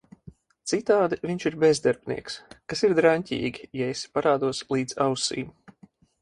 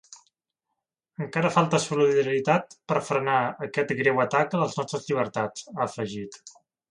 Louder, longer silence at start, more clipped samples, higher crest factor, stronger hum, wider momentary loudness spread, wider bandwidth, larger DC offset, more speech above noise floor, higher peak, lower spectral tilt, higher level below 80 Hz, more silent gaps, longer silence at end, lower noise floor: about the same, -25 LUFS vs -25 LUFS; first, 0.25 s vs 0.1 s; neither; about the same, 20 dB vs 20 dB; neither; about the same, 12 LU vs 10 LU; about the same, 11.5 kHz vs 11 kHz; neither; second, 32 dB vs 58 dB; about the same, -6 dBFS vs -6 dBFS; about the same, -4.5 dB/octave vs -5.5 dB/octave; first, -60 dBFS vs -70 dBFS; neither; first, 0.7 s vs 0.4 s; second, -57 dBFS vs -83 dBFS